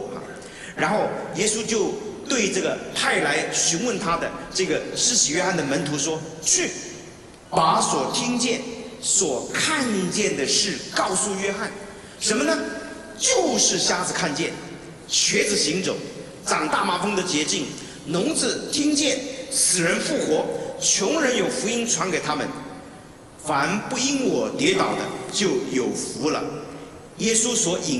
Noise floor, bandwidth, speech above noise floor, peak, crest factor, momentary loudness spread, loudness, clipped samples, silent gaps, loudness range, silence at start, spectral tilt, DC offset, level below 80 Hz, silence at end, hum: -43 dBFS; 13.5 kHz; 21 dB; -4 dBFS; 20 dB; 14 LU; -22 LUFS; under 0.1%; none; 3 LU; 0 s; -2 dB/octave; under 0.1%; -56 dBFS; 0 s; none